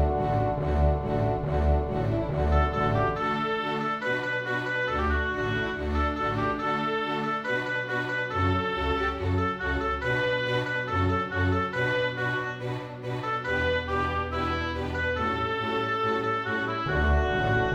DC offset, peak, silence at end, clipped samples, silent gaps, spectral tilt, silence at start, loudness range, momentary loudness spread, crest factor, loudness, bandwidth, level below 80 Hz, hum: under 0.1%; -12 dBFS; 0 s; under 0.1%; none; -7 dB/octave; 0 s; 2 LU; 3 LU; 16 dB; -27 LUFS; 8 kHz; -34 dBFS; none